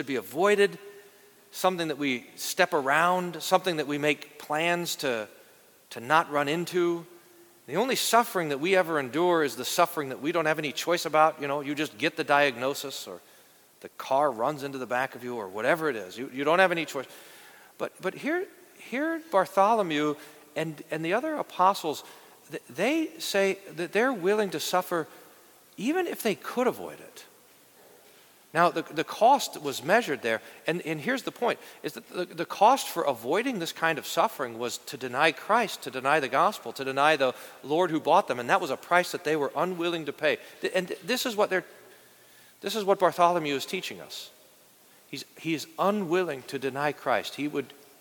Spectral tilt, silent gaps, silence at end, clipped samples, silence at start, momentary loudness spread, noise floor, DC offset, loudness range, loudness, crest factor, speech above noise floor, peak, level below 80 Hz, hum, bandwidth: -4 dB/octave; none; 0.3 s; under 0.1%; 0 s; 13 LU; -57 dBFS; under 0.1%; 4 LU; -27 LUFS; 22 dB; 30 dB; -6 dBFS; -78 dBFS; none; 19 kHz